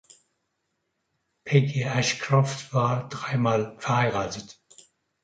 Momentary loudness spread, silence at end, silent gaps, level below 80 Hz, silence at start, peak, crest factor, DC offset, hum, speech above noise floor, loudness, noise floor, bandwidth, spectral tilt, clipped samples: 10 LU; 0.7 s; none; -62 dBFS; 1.45 s; -6 dBFS; 22 dB; under 0.1%; none; 53 dB; -25 LUFS; -77 dBFS; 9.2 kHz; -5.5 dB/octave; under 0.1%